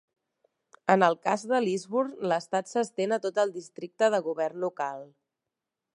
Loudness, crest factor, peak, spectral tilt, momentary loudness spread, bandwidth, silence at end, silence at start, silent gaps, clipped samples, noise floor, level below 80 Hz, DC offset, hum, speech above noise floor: -28 LUFS; 24 dB; -6 dBFS; -5 dB/octave; 11 LU; 11.5 kHz; 0.9 s; 0.85 s; none; under 0.1%; -87 dBFS; -84 dBFS; under 0.1%; none; 60 dB